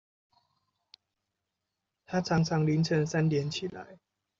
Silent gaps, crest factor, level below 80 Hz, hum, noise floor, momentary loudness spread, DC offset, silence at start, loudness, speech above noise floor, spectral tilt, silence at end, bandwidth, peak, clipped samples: none; 18 dB; -64 dBFS; none; -86 dBFS; 10 LU; under 0.1%; 2.1 s; -29 LUFS; 57 dB; -6 dB/octave; 0.45 s; 7.6 kHz; -14 dBFS; under 0.1%